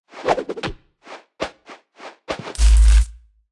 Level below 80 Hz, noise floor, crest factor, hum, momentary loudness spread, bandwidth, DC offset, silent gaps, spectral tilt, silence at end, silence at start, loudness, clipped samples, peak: -20 dBFS; -45 dBFS; 16 dB; none; 25 LU; 11.5 kHz; under 0.1%; none; -5 dB/octave; 0.4 s; 0.15 s; -21 LUFS; under 0.1%; -4 dBFS